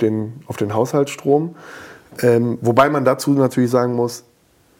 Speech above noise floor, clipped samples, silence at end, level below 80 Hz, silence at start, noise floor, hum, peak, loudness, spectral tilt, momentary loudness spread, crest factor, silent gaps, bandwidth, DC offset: 38 dB; under 0.1%; 0.6 s; -58 dBFS; 0 s; -56 dBFS; none; -2 dBFS; -18 LUFS; -6.5 dB/octave; 19 LU; 16 dB; none; 17 kHz; under 0.1%